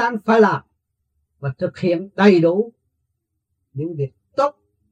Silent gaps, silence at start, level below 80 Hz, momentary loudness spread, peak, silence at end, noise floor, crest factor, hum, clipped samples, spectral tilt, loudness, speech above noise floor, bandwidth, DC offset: none; 0 s; -68 dBFS; 15 LU; 0 dBFS; 0.4 s; -75 dBFS; 20 dB; none; under 0.1%; -7.5 dB/octave; -19 LUFS; 58 dB; 7.8 kHz; under 0.1%